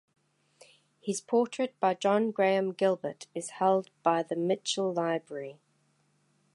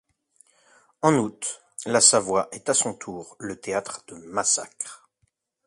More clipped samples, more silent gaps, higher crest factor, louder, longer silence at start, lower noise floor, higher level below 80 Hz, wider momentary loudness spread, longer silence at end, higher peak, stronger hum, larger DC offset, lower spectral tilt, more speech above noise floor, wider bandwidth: neither; neither; about the same, 20 dB vs 22 dB; second, -29 LUFS vs -22 LUFS; about the same, 1.05 s vs 1.05 s; about the same, -71 dBFS vs -72 dBFS; second, -84 dBFS vs -66 dBFS; second, 12 LU vs 20 LU; first, 1 s vs 0.7 s; second, -12 dBFS vs -4 dBFS; neither; neither; first, -4.5 dB/octave vs -2.5 dB/octave; second, 42 dB vs 48 dB; about the same, 11.5 kHz vs 11.5 kHz